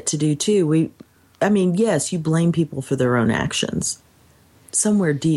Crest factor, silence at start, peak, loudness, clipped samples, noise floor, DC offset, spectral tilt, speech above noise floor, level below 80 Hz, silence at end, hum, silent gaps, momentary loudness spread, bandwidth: 14 dB; 0.05 s; -6 dBFS; -20 LUFS; under 0.1%; -53 dBFS; under 0.1%; -5 dB/octave; 35 dB; -52 dBFS; 0 s; none; none; 6 LU; 12.5 kHz